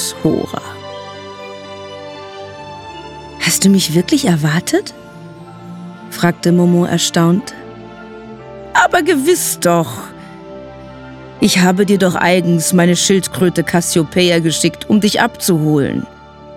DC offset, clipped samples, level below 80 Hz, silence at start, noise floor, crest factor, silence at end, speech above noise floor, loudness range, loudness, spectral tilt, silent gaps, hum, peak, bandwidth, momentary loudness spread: under 0.1%; under 0.1%; -48 dBFS; 0 s; -34 dBFS; 14 dB; 0 s; 21 dB; 4 LU; -13 LUFS; -4.5 dB/octave; none; none; -2 dBFS; 16.5 kHz; 21 LU